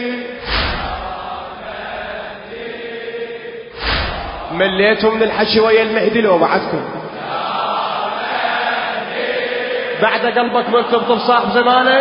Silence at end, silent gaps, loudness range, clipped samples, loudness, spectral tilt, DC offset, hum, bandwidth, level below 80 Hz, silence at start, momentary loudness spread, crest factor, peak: 0 s; none; 9 LU; under 0.1%; -16 LUFS; -9 dB/octave; under 0.1%; none; 5.4 kHz; -36 dBFS; 0 s; 14 LU; 16 dB; 0 dBFS